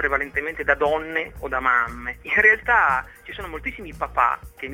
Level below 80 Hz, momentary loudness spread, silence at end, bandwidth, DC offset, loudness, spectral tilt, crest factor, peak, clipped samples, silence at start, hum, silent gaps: -42 dBFS; 16 LU; 0 s; 17 kHz; under 0.1%; -21 LUFS; -5 dB/octave; 20 dB; -2 dBFS; under 0.1%; 0 s; none; none